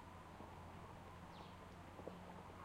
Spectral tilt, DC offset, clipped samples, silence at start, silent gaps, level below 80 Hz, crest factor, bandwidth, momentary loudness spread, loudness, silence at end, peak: -6 dB/octave; under 0.1%; under 0.1%; 0 s; none; -68 dBFS; 20 dB; 16 kHz; 2 LU; -57 LUFS; 0 s; -36 dBFS